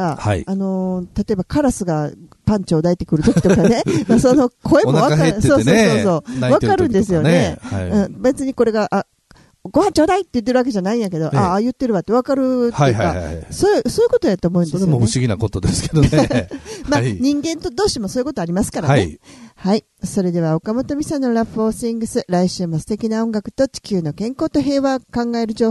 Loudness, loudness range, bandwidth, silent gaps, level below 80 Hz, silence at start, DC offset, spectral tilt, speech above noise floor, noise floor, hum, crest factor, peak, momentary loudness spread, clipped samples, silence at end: -17 LUFS; 6 LU; 12.5 kHz; none; -38 dBFS; 0 s; under 0.1%; -6.5 dB/octave; 34 dB; -50 dBFS; none; 16 dB; 0 dBFS; 8 LU; under 0.1%; 0 s